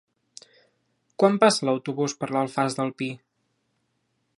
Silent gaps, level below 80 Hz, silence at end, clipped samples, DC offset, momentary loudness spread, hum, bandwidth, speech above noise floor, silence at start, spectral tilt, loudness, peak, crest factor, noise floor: none; -76 dBFS; 1.25 s; under 0.1%; under 0.1%; 13 LU; none; 11.5 kHz; 50 dB; 1.2 s; -4.5 dB/octave; -24 LUFS; -4 dBFS; 24 dB; -74 dBFS